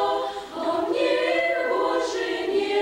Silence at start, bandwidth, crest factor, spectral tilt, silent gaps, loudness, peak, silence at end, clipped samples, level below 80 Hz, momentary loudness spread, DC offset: 0 s; 16 kHz; 12 dB; -3 dB/octave; none; -24 LUFS; -12 dBFS; 0 s; under 0.1%; -60 dBFS; 6 LU; under 0.1%